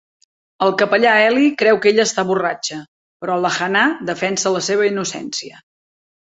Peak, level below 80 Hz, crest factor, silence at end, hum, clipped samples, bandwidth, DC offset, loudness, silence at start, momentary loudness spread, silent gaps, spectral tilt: -2 dBFS; -64 dBFS; 16 dB; 0.9 s; none; under 0.1%; 8.2 kHz; under 0.1%; -16 LUFS; 0.6 s; 13 LU; 2.88-3.20 s; -3.5 dB/octave